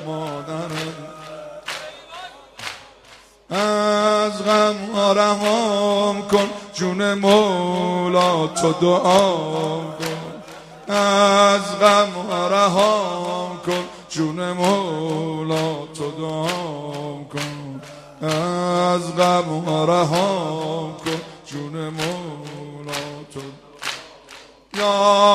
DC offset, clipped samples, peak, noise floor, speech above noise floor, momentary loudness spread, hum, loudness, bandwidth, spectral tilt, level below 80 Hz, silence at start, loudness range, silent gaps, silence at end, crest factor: under 0.1%; under 0.1%; 0 dBFS; -48 dBFS; 29 dB; 19 LU; none; -20 LUFS; 15.5 kHz; -4.5 dB/octave; -60 dBFS; 0 s; 11 LU; none; 0 s; 20 dB